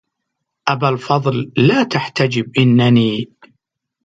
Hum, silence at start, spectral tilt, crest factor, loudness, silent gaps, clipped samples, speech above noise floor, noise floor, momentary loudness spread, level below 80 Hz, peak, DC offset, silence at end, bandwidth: none; 0.65 s; -7 dB/octave; 16 dB; -15 LUFS; none; under 0.1%; 62 dB; -76 dBFS; 9 LU; -56 dBFS; 0 dBFS; under 0.1%; 0.8 s; 7.8 kHz